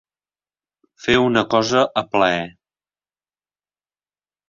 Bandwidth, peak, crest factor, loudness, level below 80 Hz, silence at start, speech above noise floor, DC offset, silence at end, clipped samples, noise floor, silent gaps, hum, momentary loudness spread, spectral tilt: 7.4 kHz; -2 dBFS; 20 dB; -18 LUFS; -54 dBFS; 1.05 s; over 72 dB; under 0.1%; 2 s; under 0.1%; under -90 dBFS; none; 50 Hz at -60 dBFS; 10 LU; -4.5 dB/octave